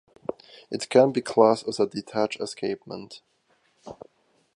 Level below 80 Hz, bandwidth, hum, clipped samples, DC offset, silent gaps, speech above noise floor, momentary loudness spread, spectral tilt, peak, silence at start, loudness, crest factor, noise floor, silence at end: -70 dBFS; 11.5 kHz; none; under 0.1%; under 0.1%; none; 43 dB; 23 LU; -5 dB/octave; -4 dBFS; 0.7 s; -24 LUFS; 22 dB; -67 dBFS; 0.6 s